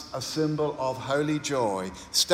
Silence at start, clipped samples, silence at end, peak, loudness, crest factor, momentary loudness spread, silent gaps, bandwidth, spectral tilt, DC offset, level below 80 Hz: 0 s; under 0.1%; 0 s; -6 dBFS; -28 LUFS; 22 dB; 5 LU; none; 17 kHz; -3.5 dB/octave; under 0.1%; -60 dBFS